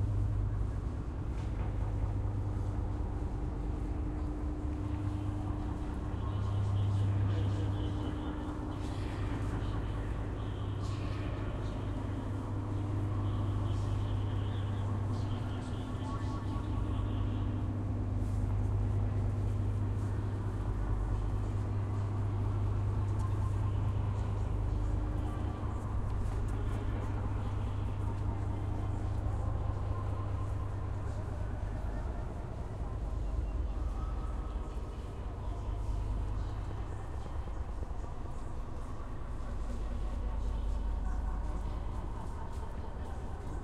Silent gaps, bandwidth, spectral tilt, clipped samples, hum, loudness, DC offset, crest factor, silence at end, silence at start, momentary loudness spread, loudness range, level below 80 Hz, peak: none; 9.8 kHz; -8 dB/octave; under 0.1%; none; -37 LUFS; under 0.1%; 12 dB; 0 s; 0 s; 8 LU; 6 LU; -38 dBFS; -22 dBFS